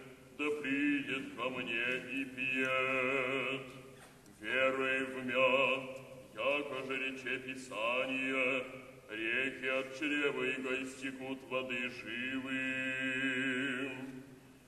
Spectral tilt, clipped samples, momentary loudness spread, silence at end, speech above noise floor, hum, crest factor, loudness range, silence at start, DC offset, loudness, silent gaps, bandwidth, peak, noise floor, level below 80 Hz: -4 dB/octave; under 0.1%; 13 LU; 0.05 s; 21 dB; none; 18 dB; 3 LU; 0 s; under 0.1%; -35 LUFS; none; 13 kHz; -18 dBFS; -57 dBFS; -74 dBFS